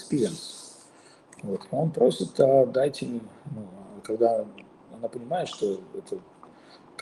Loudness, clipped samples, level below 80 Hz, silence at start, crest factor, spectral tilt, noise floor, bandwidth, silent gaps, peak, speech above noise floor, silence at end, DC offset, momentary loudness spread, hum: -26 LUFS; under 0.1%; -72 dBFS; 0 s; 22 dB; -6 dB/octave; -54 dBFS; 12.5 kHz; none; -6 dBFS; 28 dB; 0 s; under 0.1%; 20 LU; none